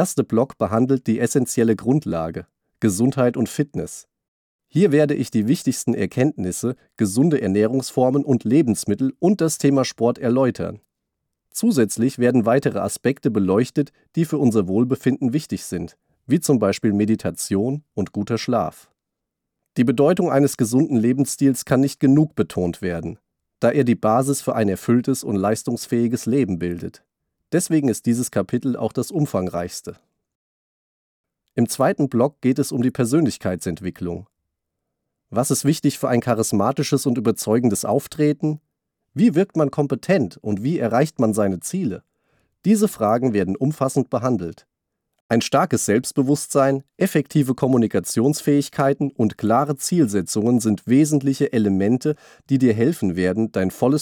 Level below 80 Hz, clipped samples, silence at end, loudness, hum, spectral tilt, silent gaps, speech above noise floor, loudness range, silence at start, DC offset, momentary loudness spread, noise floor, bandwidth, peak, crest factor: -58 dBFS; under 0.1%; 0 s; -20 LUFS; none; -6 dB/octave; 4.28-4.59 s, 30.35-31.24 s, 45.21-45.29 s; 62 dB; 4 LU; 0 s; under 0.1%; 8 LU; -82 dBFS; 20 kHz; -6 dBFS; 14 dB